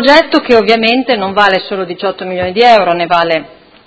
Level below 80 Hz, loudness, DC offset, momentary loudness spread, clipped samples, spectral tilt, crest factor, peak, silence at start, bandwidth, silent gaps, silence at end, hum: -46 dBFS; -10 LUFS; under 0.1%; 10 LU; 1%; -5 dB/octave; 10 dB; 0 dBFS; 0 s; 8 kHz; none; 0.4 s; none